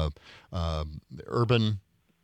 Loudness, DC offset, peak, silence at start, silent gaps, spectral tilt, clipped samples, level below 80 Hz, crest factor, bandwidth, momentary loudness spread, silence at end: -30 LUFS; under 0.1%; -10 dBFS; 0 s; none; -7.5 dB/octave; under 0.1%; -44 dBFS; 20 dB; 9 kHz; 16 LU; 0.45 s